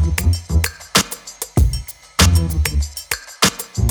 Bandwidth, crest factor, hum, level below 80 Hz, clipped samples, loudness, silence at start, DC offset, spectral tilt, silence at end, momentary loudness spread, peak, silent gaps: over 20 kHz; 18 dB; none; -22 dBFS; under 0.1%; -18 LUFS; 0 s; under 0.1%; -3.5 dB/octave; 0 s; 11 LU; 0 dBFS; none